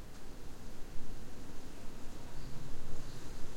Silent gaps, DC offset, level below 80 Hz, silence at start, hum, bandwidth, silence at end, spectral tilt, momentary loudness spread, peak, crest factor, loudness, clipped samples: none; under 0.1%; -44 dBFS; 0 s; none; 10.5 kHz; 0 s; -5 dB/octave; 3 LU; -20 dBFS; 12 dB; -51 LUFS; under 0.1%